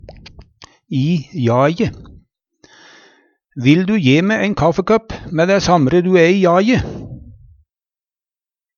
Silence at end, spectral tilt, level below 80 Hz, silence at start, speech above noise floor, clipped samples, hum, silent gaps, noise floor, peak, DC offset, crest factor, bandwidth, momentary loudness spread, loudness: 1.45 s; -6.5 dB/octave; -42 dBFS; 0.1 s; over 76 dB; under 0.1%; none; none; under -90 dBFS; 0 dBFS; under 0.1%; 16 dB; 7.2 kHz; 12 LU; -15 LUFS